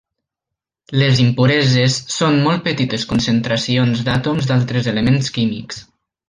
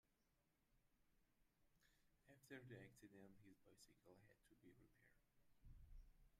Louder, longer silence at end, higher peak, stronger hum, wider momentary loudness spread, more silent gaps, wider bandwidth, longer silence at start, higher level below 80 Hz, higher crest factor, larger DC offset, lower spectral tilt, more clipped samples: first, -16 LUFS vs -65 LUFS; first, 0.45 s vs 0 s; first, -2 dBFS vs -46 dBFS; neither; about the same, 7 LU vs 8 LU; neither; second, 9.8 kHz vs 14 kHz; first, 0.9 s vs 0.05 s; first, -46 dBFS vs -74 dBFS; second, 14 dB vs 24 dB; neither; about the same, -5.5 dB/octave vs -5.5 dB/octave; neither